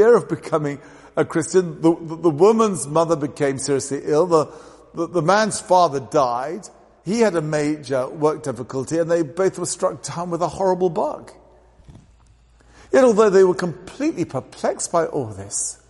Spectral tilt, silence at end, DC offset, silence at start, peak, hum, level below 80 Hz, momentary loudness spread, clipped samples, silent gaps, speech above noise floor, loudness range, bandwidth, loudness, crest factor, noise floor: -5 dB/octave; 0.15 s; under 0.1%; 0 s; -2 dBFS; none; -56 dBFS; 12 LU; under 0.1%; none; 33 dB; 4 LU; 11.5 kHz; -20 LUFS; 18 dB; -52 dBFS